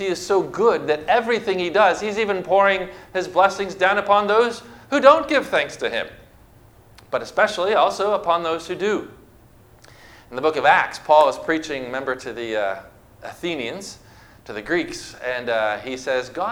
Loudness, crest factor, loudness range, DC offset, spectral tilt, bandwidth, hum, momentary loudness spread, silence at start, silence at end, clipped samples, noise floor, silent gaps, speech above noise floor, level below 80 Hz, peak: -20 LUFS; 20 dB; 9 LU; under 0.1%; -4 dB/octave; 16.5 kHz; none; 13 LU; 0 s; 0 s; under 0.1%; -50 dBFS; none; 30 dB; -56 dBFS; 0 dBFS